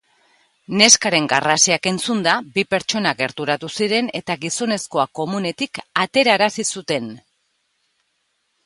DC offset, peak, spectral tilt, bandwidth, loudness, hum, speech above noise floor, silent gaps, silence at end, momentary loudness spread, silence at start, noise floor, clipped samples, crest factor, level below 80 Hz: under 0.1%; 0 dBFS; -2 dB/octave; 16 kHz; -18 LUFS; none; 50 dB; none; 1.45 s; 11 LU; 0.7 s; -69 dBFS; under 0.1%; 20 dB; -64 dBFS